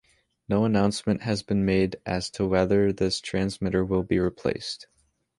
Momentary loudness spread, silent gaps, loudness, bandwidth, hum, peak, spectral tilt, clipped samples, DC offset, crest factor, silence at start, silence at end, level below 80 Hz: 7 LU; none; -25 LUFS; 11.5 kHz; none; -8 dBFS; -6 dB/octave; under 0.1%; under 0.1%; 18 dB; 0.5 s; 0.55 s; -46 dBFS